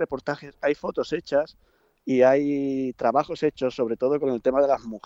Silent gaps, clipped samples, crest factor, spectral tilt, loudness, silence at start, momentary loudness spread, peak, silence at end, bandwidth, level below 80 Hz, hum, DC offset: none; under 0.1%; 18 dB; -6.5 dB/octave; -24 LUFS; 0 s; 9 LU; -6 dBFS; 0.1 s; 7.8 kHz; -60 dBFS; none; under 0.1%